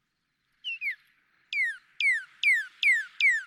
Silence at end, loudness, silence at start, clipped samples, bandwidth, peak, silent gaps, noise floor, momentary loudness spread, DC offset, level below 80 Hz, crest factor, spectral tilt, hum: 0 s; -26 LUFS; 0.65 s; under 0.1%; 16 kHz; -14 dBFS; none; -78 dBFS; 12 LU; under 0.1%; -90 dBFS; 16 dB; 5.5 dB/octave; none